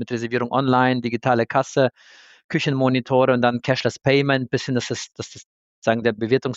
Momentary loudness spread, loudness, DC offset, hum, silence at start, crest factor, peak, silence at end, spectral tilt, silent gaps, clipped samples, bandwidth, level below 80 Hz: 9 LU; -21 LUFS; under 0.1%; none; 0 s; 16 dB; -4 dBFS; 0 s; -6 dB/octave; 2.44-2.49 s, 5.46-5.82 s; under 0.1%; 8 kHz; -62 dBFS